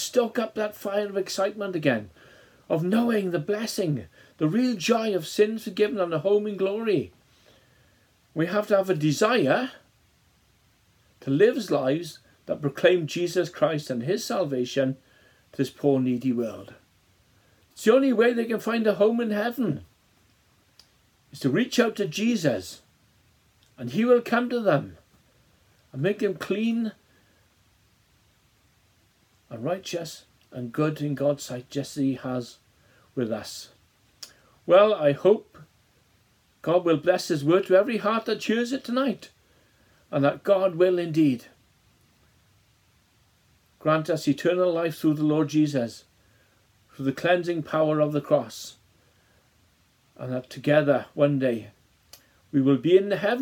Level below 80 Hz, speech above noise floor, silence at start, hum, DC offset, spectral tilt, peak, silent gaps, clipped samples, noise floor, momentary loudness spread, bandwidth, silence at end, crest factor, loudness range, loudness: -70 dBFS; 40 dB; 0 s; none; under 0.1%; -6 dB/octave; -6 dBFS; none; under 0.1%; -64 dBFS; 13 LU; 18.5 kHz; 0 s; 20 dB; 6 LU; -25 LUFS